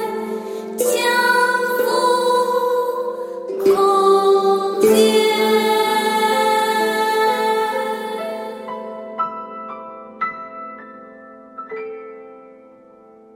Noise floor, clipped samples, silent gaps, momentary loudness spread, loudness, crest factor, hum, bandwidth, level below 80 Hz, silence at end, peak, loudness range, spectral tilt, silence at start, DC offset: -46 dBFS; under 0.1%; none; 18 LU; -17 LUFS; 16 dB; none; 16.5 kHz; -68 dBFS; 0.85 s; -2 dBFS; 15 LU; -3 dB/octave; 0 s; under 0.1%